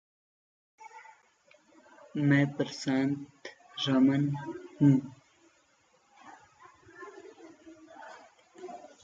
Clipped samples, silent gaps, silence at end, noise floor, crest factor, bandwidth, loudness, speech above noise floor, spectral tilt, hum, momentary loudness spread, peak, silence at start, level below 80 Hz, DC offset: under 0.1%; none; 0.25 s; -68 dBFS; 22 dB; 7.6 kHz; -29 LUFS; 41 dB; -6.5 dB/octave; none; 25 LU; -12 dBFS; 0.8 s; -78 dBFS; under 0.1%